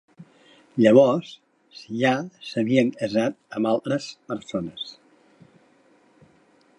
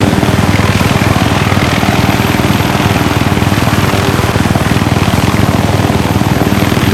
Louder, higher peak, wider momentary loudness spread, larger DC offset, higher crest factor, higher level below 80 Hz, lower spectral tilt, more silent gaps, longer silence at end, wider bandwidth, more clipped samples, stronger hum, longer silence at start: second, -23 LUFS vs -10 LUFS; about the same, -2 dBFS vs 0 dBFS; first, 18 LU vs 1 LU; neither; first, 22 dB vs 10 dB; second, -68 dBFS vs -24 dBFS; about the same, -6.5 dB/octave vs -5.5 dB/octave; neither; first, 1.85 s vs 0 s; second, 11 kHz vs 17 kHz; second, under 0.1% vs 1%; neither; first, 0.2 s vs 0 s